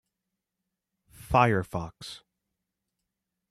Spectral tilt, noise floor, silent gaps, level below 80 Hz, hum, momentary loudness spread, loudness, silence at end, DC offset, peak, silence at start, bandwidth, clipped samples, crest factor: -6.5 dB/octave; -86 dBFS; none; -52 dBFS; none; 20 LU; -26 LUFS; 1.35 s; under 0.1%; -8 dBFS; 1.25 s; 14 kHz; under 0.1%; 24 dB